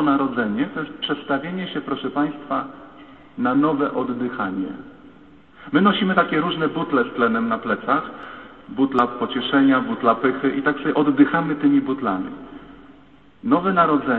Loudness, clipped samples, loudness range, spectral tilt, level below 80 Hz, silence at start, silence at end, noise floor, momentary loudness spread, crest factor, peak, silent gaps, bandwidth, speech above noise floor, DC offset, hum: -21 LUFS; under 0.1%; 5 LU; -9 dB/octave; -58 dBFS; 0 s; 0 s; -50 dBFS; 15 LU; 20 dB; -2 dBFS; none; 4.3 kHz; 30 dB; 0.2%; none